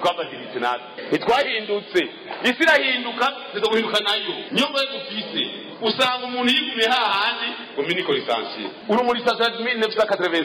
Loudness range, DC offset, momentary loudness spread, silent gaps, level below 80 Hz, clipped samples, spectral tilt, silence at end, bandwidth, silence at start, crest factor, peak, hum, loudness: 2 LU; under 0.1%; 8 LU; none; -64 dBFS; under 0.1%; -3.5 dB/octave; 0 s; 16.5 kHz; 0 s; 14 dB; -8 dBFS; none; -21 LUFS